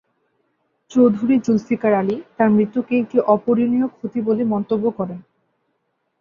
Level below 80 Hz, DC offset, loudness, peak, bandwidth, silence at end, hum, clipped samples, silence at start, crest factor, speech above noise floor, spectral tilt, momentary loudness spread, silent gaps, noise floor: -62 dBFS; under 0.1%; -19 LUFS; -2 dBFS; 7.2 kHz; 1 s; none; under 0.1%; 0.9 s; 16 dB; 53 dB; -8.5 dB/octave; 8 LU; none; -71 dBFS